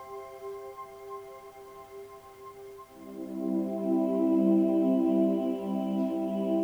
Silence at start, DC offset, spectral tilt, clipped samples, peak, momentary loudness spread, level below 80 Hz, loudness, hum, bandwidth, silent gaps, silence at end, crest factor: 0 s; under 0.1%; -9 dB/octave; under 0.1%; -14 dBFS; 23 LU; -70 dBFS; -28 LUFS; none; over 20 kHz; none; 0 s; 16 dB